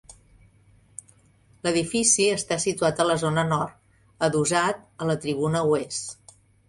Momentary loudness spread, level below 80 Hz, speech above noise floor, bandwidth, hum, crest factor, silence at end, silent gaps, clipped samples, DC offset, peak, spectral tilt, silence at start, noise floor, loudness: 14 LU; -58 dBFS; 35 dB; 11.5 kHz; none; 20 dB; 0.55 s; none; under 0.1%; under 0.1%; -6 dBFS; -3.5 dB/octave; 0.1 s; -58 dBFS; -24 LUFS